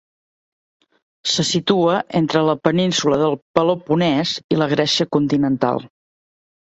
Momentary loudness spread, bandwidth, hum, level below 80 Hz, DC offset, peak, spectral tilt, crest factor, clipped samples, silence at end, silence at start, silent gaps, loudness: 3 LU; 8.2 kHz; none; -56 dBFS; under 0.1%; 0 dBFS; -5 dB/octave; 18 dB; under 0.1%; 0.75 s; 1.25 s; 3.42-3.54 s, 4.44-4.49 s; -18 LUFS